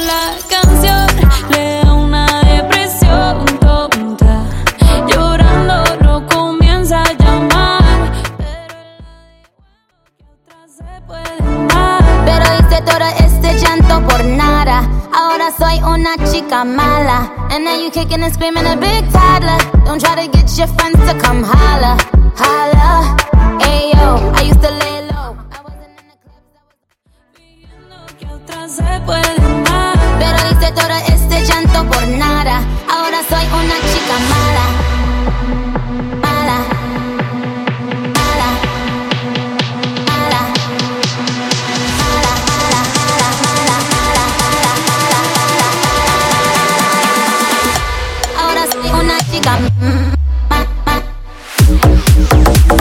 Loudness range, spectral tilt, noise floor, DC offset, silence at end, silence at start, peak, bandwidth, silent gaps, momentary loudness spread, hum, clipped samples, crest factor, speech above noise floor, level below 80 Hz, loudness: 6 LU; -4.5 dB/octave; -59 dBFS; under 0.1%; 0 s; 0 s; 0 dBFS; 17 kHz; none; 8 LU; none; under 0.1%; 10 dB; 49 dB; -14 dBFS; -12 LUFS